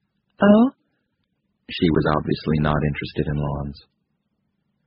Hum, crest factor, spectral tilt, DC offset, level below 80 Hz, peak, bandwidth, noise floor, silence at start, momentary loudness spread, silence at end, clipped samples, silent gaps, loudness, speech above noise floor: none; 20 dB; -6.5 dB/octave; under 0.1%; -40 dBFS; -4 dBFS; 5.4 kHz; -73 dBFS; 0.4 s; 13 LU; 1.1 s; under 0.1%; none; -21 LUFS; 53 dB